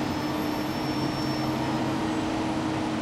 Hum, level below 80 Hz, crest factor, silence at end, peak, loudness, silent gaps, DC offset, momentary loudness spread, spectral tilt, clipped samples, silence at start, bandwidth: none; -50 dBFS; 12 dB; 0 s; -16 dBFS; -28 LUFS; none; under 0.1%; 1 LU; -5.5 dB/octave; under 0.1%; 0 s; 14 kHz